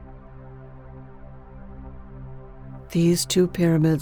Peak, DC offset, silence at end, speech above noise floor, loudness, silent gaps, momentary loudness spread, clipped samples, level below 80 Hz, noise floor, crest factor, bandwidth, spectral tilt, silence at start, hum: -8 dBFS; under 0.1%; 0 s; 22 dB; -21 LUFS; none; 25 LU; under 0.1%; -44 dBFS; -41 dBFS; 18 dB; over 20 kHz; -6 dB/octave; 0 s; none